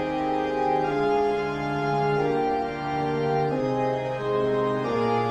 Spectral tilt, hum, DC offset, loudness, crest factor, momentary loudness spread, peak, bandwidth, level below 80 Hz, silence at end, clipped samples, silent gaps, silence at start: -7.5 dB/octave; none; under 0.1%; -25 LUFS; 12 dB; 3 LU; -12 dBFS; 10.5 kHz; -52 dBFS; 0 s; under 0.1%; none; 0 s